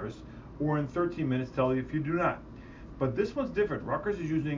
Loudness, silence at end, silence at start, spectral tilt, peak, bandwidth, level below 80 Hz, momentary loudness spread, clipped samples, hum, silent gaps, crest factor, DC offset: -31 LUFS; 0 s; 0 s; -8.5 dB/octave; -14 dBFS; 7.6 kHz; -52 dBFS; 17 LU; under 0.1%; none; none; 18 dB; under 0.1%